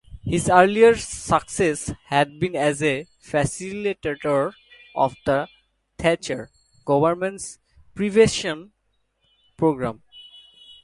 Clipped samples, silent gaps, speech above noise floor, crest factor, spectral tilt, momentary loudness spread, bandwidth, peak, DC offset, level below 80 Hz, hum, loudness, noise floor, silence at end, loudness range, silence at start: under 0.1%; none; 49 dB; 22 dB; -5 dB/octave; 15 LU; 11.5 kHz; 0 dBFS; under 0.1%; -48 dBFS; none; -22 LUFS; -70 dBFS; 0.6 s; 5 LU; 0.1 s